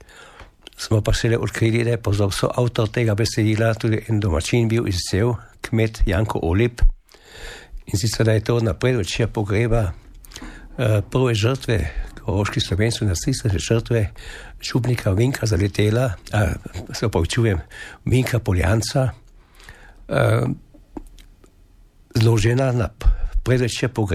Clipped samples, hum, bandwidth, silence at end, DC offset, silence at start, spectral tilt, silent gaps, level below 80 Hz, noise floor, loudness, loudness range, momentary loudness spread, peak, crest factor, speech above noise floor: under 0.1%; none; 14.5 kHz; 0 s; under 0.1%; 0.15 s; -6 dB/octave; none; -30 dBFS; -50 dBFS; -21 LUFS; 3 LU; 12 LU; -4 dBFS; 16 dB; 31 dB